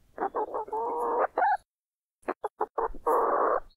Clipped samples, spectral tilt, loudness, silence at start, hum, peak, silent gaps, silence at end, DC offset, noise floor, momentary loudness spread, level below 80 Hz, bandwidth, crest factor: under 0.1%; -5.5 dB/octave; -29 LUFS; 0.2 s; none; -12 dBFS; 1.74-2.00 s, 2.52-2.56 s, 2.70-2.75 s; 0.1 s; under 0.1%; under -90 dBFS; 11 LU; -54 dBFS; 16 kHz; 16 dB